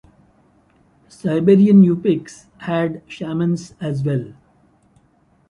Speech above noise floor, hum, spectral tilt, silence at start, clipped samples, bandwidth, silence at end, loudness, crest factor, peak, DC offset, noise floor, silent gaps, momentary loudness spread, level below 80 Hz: 41 dB; none; -8.5 dB/octave; 1.25 s; under 0.1%; 10.5 kHz; 1.2 s; -17 LUFS; 16 dB; -2 dBFS; under 0.1%; -58 dBFS; none; 16 LU; -58 dBFS